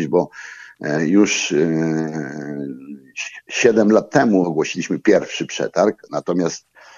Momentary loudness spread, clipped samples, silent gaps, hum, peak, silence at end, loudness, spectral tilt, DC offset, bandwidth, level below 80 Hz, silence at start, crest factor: 14 LU; under 0.1%; none; none; 0 dBFS; 0.4 s; -19 LUFS; -5 dB/octave; under 0.1%; 7.6 kHz; -66 dBFS; 0 s; 18 dB